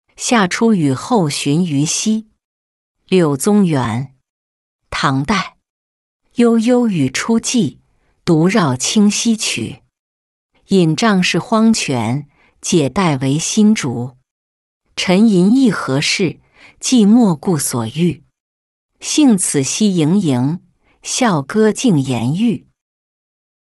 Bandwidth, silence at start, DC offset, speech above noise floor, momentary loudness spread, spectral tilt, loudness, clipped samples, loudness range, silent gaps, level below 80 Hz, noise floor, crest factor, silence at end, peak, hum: 12 kHz; 0.2 s; under 0.1%; 22 dB; 10 LU; -5 dB/octave; -15 LUFS; under 0.1%; 3 LU; 2.44-2.95 s, 4.30-4.79 s, 5.70-6.20 s, 9.99-10.49 s, 14.31-14.81 s, 18.40-18.89 s; -50 dBFS; -35 dBFS; 14 dB; 1.1 s; -2 dBFS; none